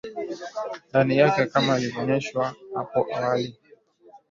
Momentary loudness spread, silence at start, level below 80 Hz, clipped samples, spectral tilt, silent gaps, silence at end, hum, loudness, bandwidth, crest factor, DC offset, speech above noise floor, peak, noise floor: 14 LU; 0.05 s; -64 dBFS; under 0.1%; -6 dB/octave; none; 0.15 s; none; -24 LUFS; 7.6 kHz; 20 dB; under 0.1%; 31 dB; -6 dBFS; -55 dBFS